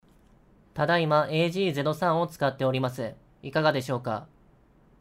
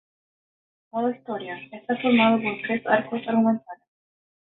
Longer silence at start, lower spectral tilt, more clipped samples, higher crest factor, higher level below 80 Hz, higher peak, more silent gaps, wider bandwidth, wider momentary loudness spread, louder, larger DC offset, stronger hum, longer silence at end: second, 0.75 s vs 0.95 s; second, -6.5 dB/octave vs -10 dB/octave; neither; about the same, 18 dB vs 20 dB; first, -62 dBFS vs -68 dBFS; second, -8 dBFS vs -4 dBFS; neither; first, 16 kHz vs 4.1 kHz; about the same, 13 LU vs 14 LU; second, -27 LUFS vs -24 LUFS; neither; neither; about the same, 0.75 s vs 0.85 s